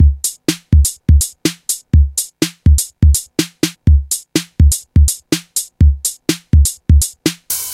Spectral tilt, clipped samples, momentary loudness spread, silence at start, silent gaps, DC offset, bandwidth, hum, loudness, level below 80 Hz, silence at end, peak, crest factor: -4.5 dB/octave; under 0.1%; 7 LU; 0 s; none; under 0.1%; 16.5 kHz; none; -15 LUFS; -16 dBFS; 0 s; 0 dBFS; 14 dB